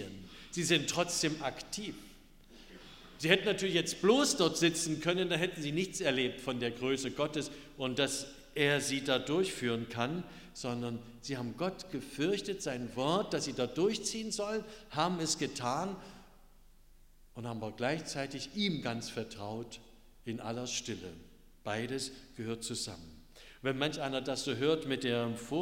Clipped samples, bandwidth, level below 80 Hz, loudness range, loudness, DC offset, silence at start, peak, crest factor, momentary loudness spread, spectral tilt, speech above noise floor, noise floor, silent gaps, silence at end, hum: under 0.1%; 16 kHz; -60 dBFS; 9 LU; -34 LUFS; under 0.1%; 0 s; -10 dBFS; 26 dB; 14 LU; -3.5 dB/octave; 25 dB; -59 dBFS; none; 0 s; none